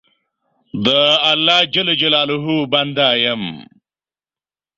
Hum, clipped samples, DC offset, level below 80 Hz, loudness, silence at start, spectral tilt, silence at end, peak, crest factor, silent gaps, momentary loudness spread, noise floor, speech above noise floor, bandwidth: none; under 0.1%; under 0.1%; -58 dBFS; -14 LUFS; 0.75 s; -4.5 dB/octave; 1.15 s; 0 dBFS; 18 dB; none; 8 LU; under -90 dBFS; over 74 dB; 7.6 kHz